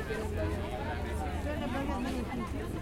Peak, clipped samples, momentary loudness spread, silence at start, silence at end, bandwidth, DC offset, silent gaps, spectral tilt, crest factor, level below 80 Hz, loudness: -20 dBFS; under 0.1%; 2 LU; 0 s; 0 s; 16.5 kHz; under 0.1%; none; -6.5 dB/octave; 14 dB; -42 dBFS; -35 LUFS